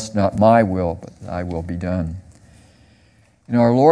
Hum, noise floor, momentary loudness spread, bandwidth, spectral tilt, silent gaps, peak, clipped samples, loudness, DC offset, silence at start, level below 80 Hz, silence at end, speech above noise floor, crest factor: none; -55 dBFS; 16 LU; 10.5 kHz; -7.5 dB/octave; none; 0 dBFS; under 0.1%; -19 LUFS; under 0.1%; 0 s; -44 dBFS; 0 s; 38 dB; 18 dB